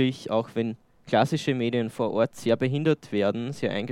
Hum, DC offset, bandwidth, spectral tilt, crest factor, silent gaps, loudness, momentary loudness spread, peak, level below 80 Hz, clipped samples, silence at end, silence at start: none; under 0.1%; 15.5 kHz; -6.5 dB/octave; 18 dB; none; -26 LUFS; 6 LU; -8 dBFS; -68 dBFS; under 0.1%; 0 s; 0 s